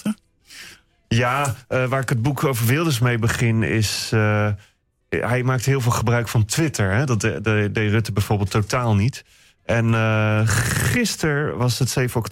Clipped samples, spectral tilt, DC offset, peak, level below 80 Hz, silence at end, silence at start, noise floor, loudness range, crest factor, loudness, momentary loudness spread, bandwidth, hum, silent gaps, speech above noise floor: under 0.1%; -5.5 dB/octave; under 0.1%; -8 dBFS; -44 dBFS; 0 s; 0.05 s; -45 dBFS; 1 LU; 12 dB; -20 LUFS; 6 LU; 16.5 kHz; none; none; 26 dB